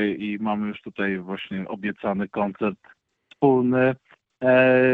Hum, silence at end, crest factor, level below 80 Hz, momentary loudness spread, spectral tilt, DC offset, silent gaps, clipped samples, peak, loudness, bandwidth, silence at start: none; 0 s; 18 dB; -62 dBFS; 13 LU; -9.5 dB/octave; under 0.1%; none; under 0.1%; -6 dBFS; -23 LUFS; 4.5 kHz; 0 s